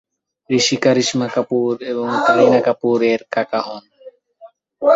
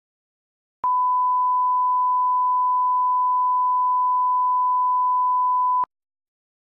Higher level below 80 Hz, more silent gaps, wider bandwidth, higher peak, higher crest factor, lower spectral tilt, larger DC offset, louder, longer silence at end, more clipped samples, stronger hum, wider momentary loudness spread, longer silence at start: first, -62 dBFS vs -76 dBFS; neither; first, 8 kHz vs 1.9 kHz; first, -2 dBFS vs -16 dBFS; first, 16 dB vs 4 dB; second, -4 dB/octave vs -5.5 dB/octave; neither; first, -17 LUFS vs -20 LUFS; second, 0 s vs 0.95 s; neither; neither; first, 9 LU vs 2 LU; second, 0.5 s vs 0.85 s